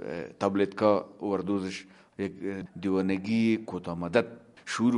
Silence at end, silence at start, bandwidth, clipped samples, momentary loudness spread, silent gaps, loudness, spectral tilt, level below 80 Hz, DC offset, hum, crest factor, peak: 0 s; 0 s; 11 kHz; under 0.1%; 12 LU; none; -30 LUFS; -6.5 dB/octave; -66 dBFS; under 0.1%; none; 22 dB; -8 dBFS